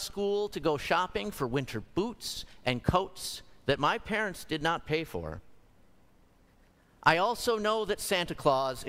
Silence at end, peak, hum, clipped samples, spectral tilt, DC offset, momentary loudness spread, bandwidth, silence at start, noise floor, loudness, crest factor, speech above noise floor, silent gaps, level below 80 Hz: 0 s; -8 dBFS; none; under 0.1%; -4.5 dB/octave; under 0.1%; 10 LU; 16 kHz; 0 s; -63 dBFS; -31 LUFS; 24 dB; 32 dB; none; -52 dBFS